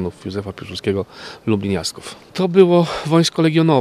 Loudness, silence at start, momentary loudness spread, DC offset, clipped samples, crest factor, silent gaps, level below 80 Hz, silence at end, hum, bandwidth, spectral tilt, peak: -18 LUFS; 0 s; 15 LU; under 0.1%; under 0.1%; 18 dB; none; -52 dBFS; 0 s; none; 13.5 kHz; -6 dB/octave; 0 dBFS